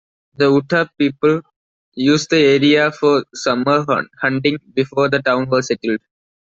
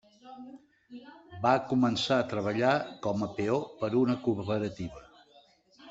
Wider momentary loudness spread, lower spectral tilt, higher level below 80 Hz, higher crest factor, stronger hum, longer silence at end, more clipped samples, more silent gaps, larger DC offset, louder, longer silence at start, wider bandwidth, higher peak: second, 7 LU vs 23 LU; about the same, -5 dB/octave vs -6 dB/octave; first, -58 dBFS vs -64 dBFS; second, 14 dB vs 20 dB; neither; first, 0.6 s vs 0 s; neither; first, 1.56-1.92 s vs none; neither; first, -16 LUFS vs -29 LUFS; first, 0.4 s vs 0.25 s; about the same, 7.8 kHz vs 8 kHz; first, -2 dBFS vs -10 dBFS